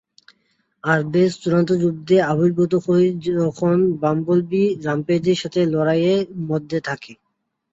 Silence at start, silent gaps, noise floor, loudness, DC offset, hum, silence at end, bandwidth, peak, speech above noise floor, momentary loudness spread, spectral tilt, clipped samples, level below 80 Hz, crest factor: 0.85 s; none; -74 dBFS; -19 LUFS; under 0.1%; none; 0.6 s; 7.8 kHz; -4 dBFS; 55 dB; 7 LU; -7 dB/octave; under 0.1%; -60 dBFS; 14 dB